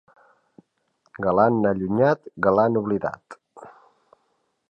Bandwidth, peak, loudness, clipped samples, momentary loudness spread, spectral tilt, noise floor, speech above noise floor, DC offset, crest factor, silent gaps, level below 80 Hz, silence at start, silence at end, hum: 8.4 kHz; -4 dBFS; -22 LUFS; under 0.1%; 11 LU; -9.5 dB/octave; -71 dBFS; 50 dB; under 0.1%; 20 dB; none; -58 dBFS; 1.15 s; 1 s; none